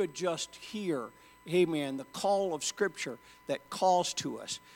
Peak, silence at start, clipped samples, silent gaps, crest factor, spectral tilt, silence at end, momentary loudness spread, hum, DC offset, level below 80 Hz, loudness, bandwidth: -16 dBFS; 0 s; under 0.1%; none; 18 dB; -3.5 dB/octave; 0 s; 11 LU; none; under 0.1%; -74 dBFS; -33 LUFS; 17 kHz